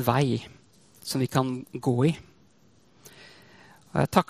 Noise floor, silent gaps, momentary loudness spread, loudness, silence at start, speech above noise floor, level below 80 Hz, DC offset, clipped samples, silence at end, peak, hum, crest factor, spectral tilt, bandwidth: -61 dBFS; none; 23 LU; -27 LUFS; 0 s; 36 dB; -58 dBFS; under 0.1%; under 0.1%; 0.05 s; -4 dBFS; none; 24 dB; -6 dB/octave; 15.5 kHz